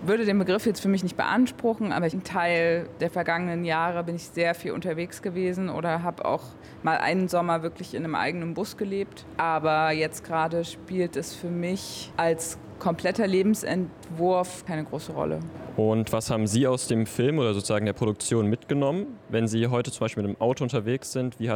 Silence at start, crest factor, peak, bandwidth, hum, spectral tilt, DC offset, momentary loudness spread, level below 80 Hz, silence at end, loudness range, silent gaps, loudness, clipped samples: 0 s; 16 dB; -12 dBFS; 19.5 kHz; none; -5.5 dB/octave; under 0.1%; 8 LU; -60 dBFS; 0 s; 3 LU; none; -27 LUFS; under 0.1%